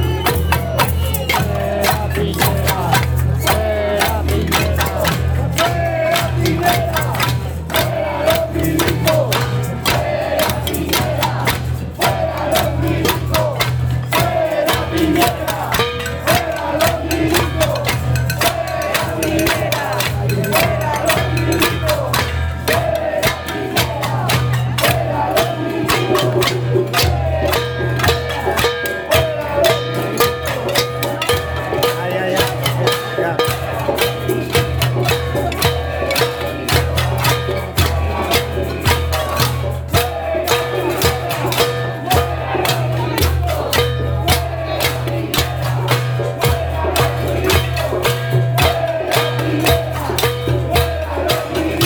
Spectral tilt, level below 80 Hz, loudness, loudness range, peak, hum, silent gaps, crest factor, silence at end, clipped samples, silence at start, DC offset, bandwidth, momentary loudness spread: -4.5 dB/octave; -28 dBFS; -17 LUFS; 1 LU; 0 dBFS; none; none; 16 dB; 0 s; under 0.1%; 0 s; under 0.1%; over 20 kHz; 4 LU